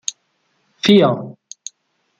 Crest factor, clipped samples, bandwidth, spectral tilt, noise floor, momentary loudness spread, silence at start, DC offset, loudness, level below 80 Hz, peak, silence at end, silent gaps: 18 dB; under 0.1%; 9.6 kHz; -5 dB/octave; -66 dBFS; 22 LU; 0.1 s; under 0.1%; -15 LUFS; -62 dBFS; -2 dBFS; 0.9 s; none